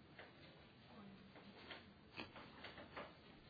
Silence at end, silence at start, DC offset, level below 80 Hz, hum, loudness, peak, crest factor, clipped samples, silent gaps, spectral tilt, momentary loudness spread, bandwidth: 0 s; 0 s; under 0.1%; -78 dBFS; none; -58 LUFS; -36 dBFS; 24 dB; under 0.1%; none; -2.5 dB/octave; 8 LU; 5.4 kHz